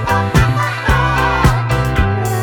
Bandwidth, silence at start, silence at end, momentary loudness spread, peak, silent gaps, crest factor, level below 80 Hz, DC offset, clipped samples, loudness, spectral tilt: 19.5 kHz; 0 s; 0 s; 3 LU; 0 dBFS; none; 14 dB; -22 dBFS; under 0.1%; under 0.1%; -14 LUFS; -6 dB/octave